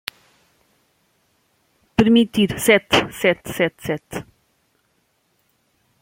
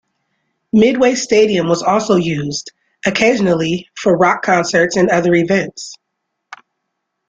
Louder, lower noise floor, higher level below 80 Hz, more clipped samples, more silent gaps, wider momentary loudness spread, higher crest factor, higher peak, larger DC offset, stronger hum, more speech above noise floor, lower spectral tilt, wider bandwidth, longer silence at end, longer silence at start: second, -18 LUFS vs -14 LUFS; second, -66 dBFS vs -74 dBFS; about the same, -50 dBFS vs -52 dBFS; neither; neither; first, 15 LU vs 9 LU; first, 22 dB vs 14 dB; about the same, 0 dBFS vs -2 dBFS; neither; neither; second, 48 dB vs 60 dB; about the same, -4.5 dB/octave vs -5 dB/octave; first, 16.5 kHz vs 9.4 kHz; first, 1.8 s vs 1.35 s; first, 2 s vs 0.75 s